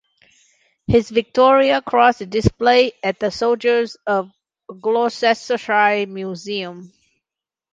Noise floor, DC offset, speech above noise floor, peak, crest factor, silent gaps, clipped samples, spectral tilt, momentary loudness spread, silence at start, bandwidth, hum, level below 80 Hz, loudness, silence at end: -88 dBFS; under 0.1%; 71 dB; -2 dBFS; 18 dB; none; under 0.1%; -5.5 dB/octave; 12 LU; 0.9 s; 7.8 kHz; none; -44 dBFS; -18 LUFS; 0.85 s